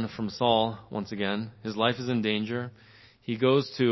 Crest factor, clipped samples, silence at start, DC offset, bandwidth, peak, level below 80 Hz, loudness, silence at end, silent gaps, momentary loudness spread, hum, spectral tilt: 20 dB; under 0.1%; 0 s; under 0.1%; 6 kHz; -8 dBFS; -62 dBFS; -28 LUFS; 0 s; none; 11 LU; none; -6.5 dB/octave